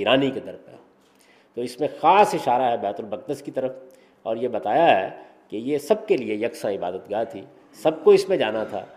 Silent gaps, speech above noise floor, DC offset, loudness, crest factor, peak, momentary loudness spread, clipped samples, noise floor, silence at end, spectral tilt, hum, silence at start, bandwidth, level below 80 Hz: none; 34 dB; under 0.1%; -22 LUFS; 20 dB; -4 dBFS; 15 LU; under 0.1%; -56 dBFS; 0.1 s; -5 dB/octave; none; 0 s; 15 kHz; -68 dBFS